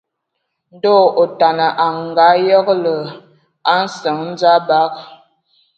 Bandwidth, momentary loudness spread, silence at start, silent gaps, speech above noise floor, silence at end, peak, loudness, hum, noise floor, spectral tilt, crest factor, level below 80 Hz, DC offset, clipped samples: 8.2 kHz; 9 LU; 0.85 s; none; 60 dB; 0.65 s; 0 dBFS; -14 LUFS; none; -74 dBFS; -5 dB/octave; 14 dB; -68 dBFS; under 0.1%; under 0.1%